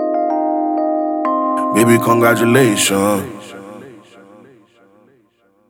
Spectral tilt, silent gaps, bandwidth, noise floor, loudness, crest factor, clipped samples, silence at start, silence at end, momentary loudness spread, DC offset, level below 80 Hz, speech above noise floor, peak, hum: -4.5 dB/octave; none; over 20 kHz; -57 dBFS; -14 LUFS; 16 dB; under 0.1%; 0 s; 1.7 s; 19 LU; under 0.1%; -64 dBFS; 44 dB; 0 dBFS; none